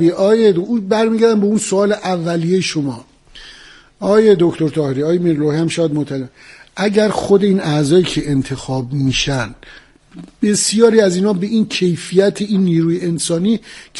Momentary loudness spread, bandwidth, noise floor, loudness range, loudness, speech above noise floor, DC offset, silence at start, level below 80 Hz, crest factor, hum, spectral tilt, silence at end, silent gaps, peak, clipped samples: 10 LU; 11.5 kHz; -42 dBFS; 2 LU; -15 LUFS; 27 dB; under 0.1%; 0 s; -44 dBFS; 14 dB; none; -5.5 dB/octave; 0 s; none; 0 dBFS; under 0.1%